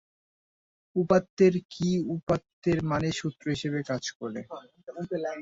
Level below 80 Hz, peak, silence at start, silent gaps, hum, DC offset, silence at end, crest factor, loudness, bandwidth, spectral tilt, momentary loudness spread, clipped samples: -58 dBFS; -8 dBFS; 0.95 s; 1.30-1.37 s, 1.65-1.69 s, 2.23-2.27 s, 2.53-2.62 s, 4.15-4.20 s; none; under 0.1%; 0 s; 20 dB; -28 LUFS; 8 kHz; -6.5 dB/octave; 15 LU; under 0.1%